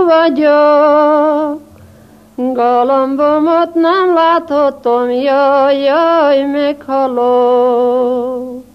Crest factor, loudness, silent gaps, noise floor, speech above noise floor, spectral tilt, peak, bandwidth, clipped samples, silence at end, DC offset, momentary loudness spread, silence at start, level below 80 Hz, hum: 12 dB; -11 LUFS; none; -41 dBFS; 30 dB; -5.5 dB/octave; 0 dBFS; 6 kHz; under 0.1%; 0.15 s; under 0.1%; 8 LU; 0 s; -56 dBFS; none